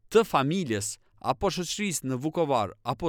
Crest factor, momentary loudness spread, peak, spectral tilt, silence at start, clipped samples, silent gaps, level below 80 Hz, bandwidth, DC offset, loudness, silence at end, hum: 20 dB; 8 LU; -8 dBFS; -4.5 dB/octave; 0.1 s; under 0.1%; none; -54 dBFS; 19 kHz; under 0.1%; -28 LUFS; 0 s; none